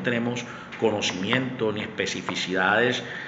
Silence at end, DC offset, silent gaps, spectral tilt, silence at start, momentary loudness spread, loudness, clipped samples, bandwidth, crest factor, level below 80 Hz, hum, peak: 0 s; under 0.1%; none; -4 dB/octave; 0 s; 7 LU; -25 LUFS; under 0.1%; 8.2 kHz; 20 dB; -64 dBFS; none; -6 dBFS